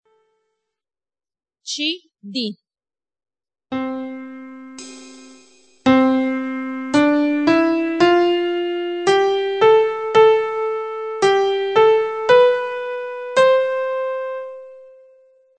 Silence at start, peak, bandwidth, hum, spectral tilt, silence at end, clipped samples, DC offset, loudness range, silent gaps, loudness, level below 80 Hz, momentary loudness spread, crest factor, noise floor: 1.65 s; -2 dBFS; 9 kHz; none; -4.5 dB/octave; 0.75 s; under 0.1%; under 0.1%; 13 LU; none; -18 LUFS; -62 dBFS; 17 LU; 18 dB; under -90 dBFS